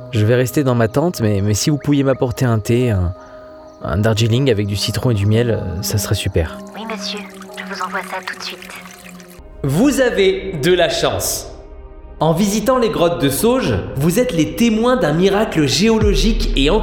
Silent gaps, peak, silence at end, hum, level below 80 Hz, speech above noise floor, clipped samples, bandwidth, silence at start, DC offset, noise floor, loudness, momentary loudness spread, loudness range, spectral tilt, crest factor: none; -4 dBFS; 0 s; none; -30 dBFS; 21 dB; under 0.1%; 19.5 kHz; 0 s; under 0.1%; -37 dBFS; -16 LUFS; 13 LU; 7 LU; -5.5 dB/octave; 14 dB